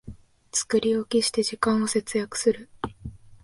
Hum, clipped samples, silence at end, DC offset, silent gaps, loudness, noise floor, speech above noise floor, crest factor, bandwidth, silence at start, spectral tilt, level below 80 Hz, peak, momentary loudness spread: none; under 0.1%; 0.1 s; under 0.1%; none; -25 LUFS; -45 dBFS; 21 dB; 18 dB; 11.5 kHz; 0.05 s; -3.5 dB/octave; -52 dBFS; -8 dBFS; 13 LU